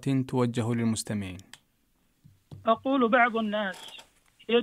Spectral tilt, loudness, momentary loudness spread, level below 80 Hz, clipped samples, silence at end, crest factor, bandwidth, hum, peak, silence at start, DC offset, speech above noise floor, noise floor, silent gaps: -5.5 dB/octave; -27 LUFS; 21 LU; -66 dBFS; under 0.1%; 0 s; 18 dB; 15.5 kHz; none; -10 dBFS; 0 s; under 0.1%; 42 dB; -69 dBFS; none